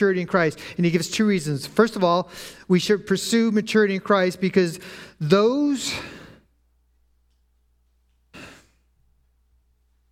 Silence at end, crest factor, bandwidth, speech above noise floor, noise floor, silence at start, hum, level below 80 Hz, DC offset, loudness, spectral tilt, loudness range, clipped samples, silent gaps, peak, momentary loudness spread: 1.6 s; 20 dB; 16 kHz; 43 dB; -64 dBFS; 0 s; 60 Hz at -45 dBFS; -60 dBFS; under 0.1%; -21 LUFS; -5.5 dB/octave; 5 LU; under 0.1%; none; -2 dBFS; 17 LU